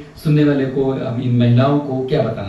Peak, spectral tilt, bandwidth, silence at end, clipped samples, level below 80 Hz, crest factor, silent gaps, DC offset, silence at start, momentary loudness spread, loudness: -2 dBFS; -9 dB/octave; 12 kHz; 0 s; under 0.1%; -46 dBFS; 12 dB; none; under 0.1%; 0 s; 6 LU; -16 LUFS